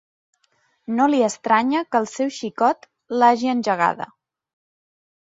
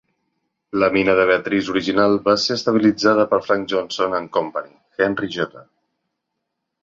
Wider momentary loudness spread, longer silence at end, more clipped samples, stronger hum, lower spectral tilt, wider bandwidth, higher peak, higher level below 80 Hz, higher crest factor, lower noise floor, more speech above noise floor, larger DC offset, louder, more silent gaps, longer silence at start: about the same, 12 LU vs 10 LU; about the same, 1.2 s vs 1.2 s; neither; neither; about the same, -4.5 dB/octave vs -5 dB/octave; about the same, 7.8 kHz vs 7.6 kHz; about the same, -4 dBFS vs -2 dBFS; second, -72 dBFS vs -56 dBFS; about the same, 18 dB vs 18 dB; second, -66 dBFS vs -78 dBFS; second, 46 dB vs 59 dB; neither; about the same, -20 LUFS vs -19 LUFS; neither; first, 0.9 s vs 0.75 s